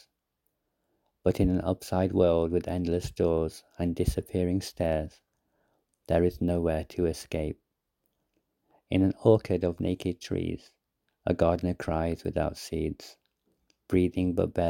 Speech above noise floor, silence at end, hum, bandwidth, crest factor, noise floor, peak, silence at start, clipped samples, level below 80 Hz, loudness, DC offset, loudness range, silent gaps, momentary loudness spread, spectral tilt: 52 dB; 0 s; none; 17 kHz; 22 dB; -80 dBFS; -6 dBFS; 1.25 s; under 0.1%; -44 dBFS; -29 LUFS; under 0.1%; 4 LU; none; 9 LU; -7.5 dB/octave